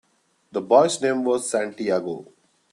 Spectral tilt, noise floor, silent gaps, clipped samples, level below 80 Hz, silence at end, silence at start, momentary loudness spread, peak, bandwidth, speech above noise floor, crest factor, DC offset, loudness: -4 dB/octave; -63 dBFS; none; under 0.1%; -70 dBFS; 0.5 s; 0.55 s; 14 LU; -2 dBFS; 12.5 kHz; 42 dB; 20 dB; under 0.1%; -22 LUFS